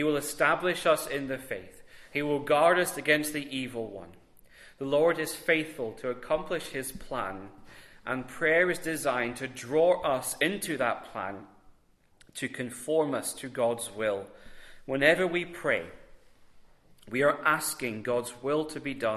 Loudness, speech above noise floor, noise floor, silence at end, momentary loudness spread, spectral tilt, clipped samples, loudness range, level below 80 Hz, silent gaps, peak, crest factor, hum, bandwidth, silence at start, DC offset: -29 LUFS; 34 dB; -63 dBFS; 0 s; 13 LU; -3.5 dB/octave; under 0.1%; 5 LU; -62 dBFS; none; -8 dBFS; 22 dB; none; 14 kHz; 0 s; under 0.1%